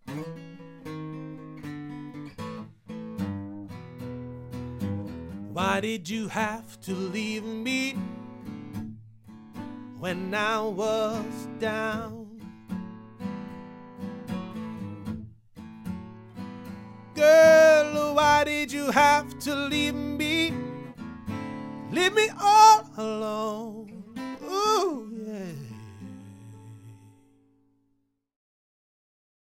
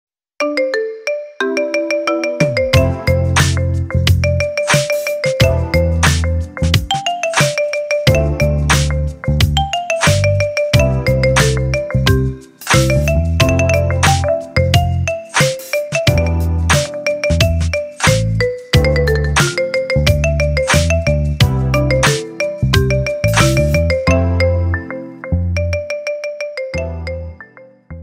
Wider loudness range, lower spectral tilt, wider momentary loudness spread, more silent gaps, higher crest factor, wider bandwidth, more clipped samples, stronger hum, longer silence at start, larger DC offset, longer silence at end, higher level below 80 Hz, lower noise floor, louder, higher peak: first, 17 LU vs 2 LU; about the same, -4 dB/octave vs -5 dB/octave; first, 22 LU vs 7 LU; neither; first, 22 dB vs 14 dB; about the same, 16 kHz vs 16 kHz; neither; neither; second, 0.05 s vs 0.4 s; neither; first, 2.55 s vs 0 s; second, -58 dBFS vs -24 dBFS; first, -73 dBFS vs -40 dBFS; second, -24 LUFS vs -15 LUFS; second, -4 dBFS vs 0 dBFS